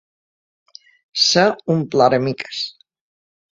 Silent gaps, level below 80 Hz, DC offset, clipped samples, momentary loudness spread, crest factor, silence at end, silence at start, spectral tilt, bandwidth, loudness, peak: none; -62 dBFS; under 0.1%; under 0.1%; 13 LU; 20 dB; 0.8 s; 1.15 s; -4 dB/octave; 7.8 kHz; -17 LUFS; 0 dBFS